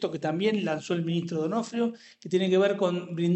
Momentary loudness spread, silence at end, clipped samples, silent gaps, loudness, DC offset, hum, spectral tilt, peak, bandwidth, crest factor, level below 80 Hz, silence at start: 7 LU; 0 s; under 0.1%; none; -27 LUFS; under 0.1%; none; -6.5 dB/octave; -12 dBFS; 8.4 kHz; 16 dB; -74 dBFS; 0 s